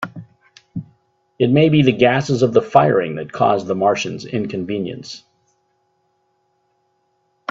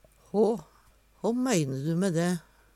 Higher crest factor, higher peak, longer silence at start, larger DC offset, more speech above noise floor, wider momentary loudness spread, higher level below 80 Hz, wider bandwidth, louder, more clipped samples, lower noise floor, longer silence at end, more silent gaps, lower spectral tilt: about the same, 18 dB vs 16 dB; first, 0 dBFS vs -14 dBFS; second, 0 s vs 0.35 s; neither; first, 49 dB vs 34 dB; first, 19 LU vs 7 LU; first, -56 dBFS vs -64 dBFS; second, 7.8 kHz vs 15 kHz; first, -17 LUFS vs -29 LUFS; neither; first, -66 dBFS vs -61 dBFS; first, 2.35 s vs 0.35 s; neither; about the same, -6.5 dB/octave vs -6 dB/octave